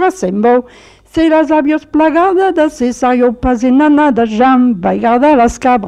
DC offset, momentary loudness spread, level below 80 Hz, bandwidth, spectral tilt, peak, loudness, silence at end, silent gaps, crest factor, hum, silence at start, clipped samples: under 0.1%; 5 LU; -36 dBFS; 11 kHz; -6 dB/octave; -2 dBFS; -11 LUFS; 0 s; none; 10 dB; none; 0 s; under 0.1%